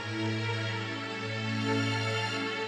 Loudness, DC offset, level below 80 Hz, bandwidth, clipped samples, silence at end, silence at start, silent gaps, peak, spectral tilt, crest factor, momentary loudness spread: -31 LUFS; under 0.1%; -72 dBFS; 10.5 kHz; under 0.1%; 0 s; 0 s; none; -18 dBFS; -5 dB/octave; 14 dB; 5 LU